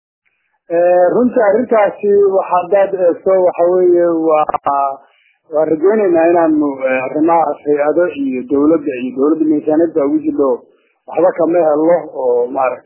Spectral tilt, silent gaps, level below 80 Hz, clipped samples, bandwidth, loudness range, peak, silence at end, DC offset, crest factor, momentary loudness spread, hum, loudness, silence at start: -11 dB/octave; none; -58 dBFS; under 0.1%; 3.2 kHz; 2 LU; 0 dBFS; 0.05 s; under 0.1%; 12 dB; 6 LU; none; -13 LUFS; 0.7 s